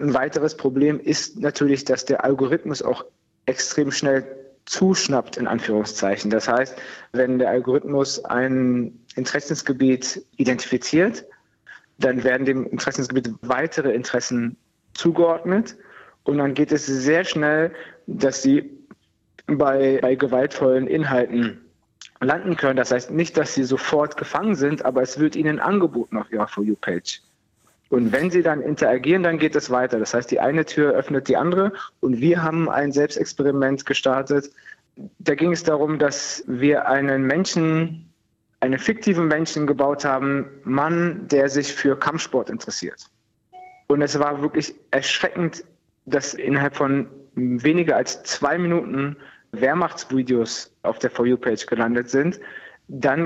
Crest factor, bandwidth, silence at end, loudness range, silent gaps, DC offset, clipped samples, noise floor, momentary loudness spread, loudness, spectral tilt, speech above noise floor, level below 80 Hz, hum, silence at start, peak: 16 dB; 8.2 kHz; 0 s; 3 LU; none; under 0.1%; under 0.1%; -68 dBFS; 8 LU; -21 LUFS; -5 dB/octave; 47 dB; -62 dBFS; none; 0 s; -6 dBFS